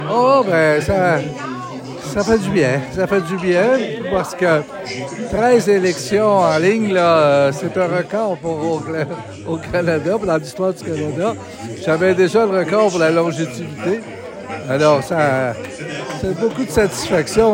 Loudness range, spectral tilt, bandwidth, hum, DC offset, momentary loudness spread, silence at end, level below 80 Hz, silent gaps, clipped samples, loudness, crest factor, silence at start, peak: 5 LU; -5.5 dB/octave; 16.5 kHz; none; under 0.1%; 12 LU; 0 s; -44 dBFS; none; under 0.1%; -17 LUFS; 16 dB; 0 s; 0 dBFS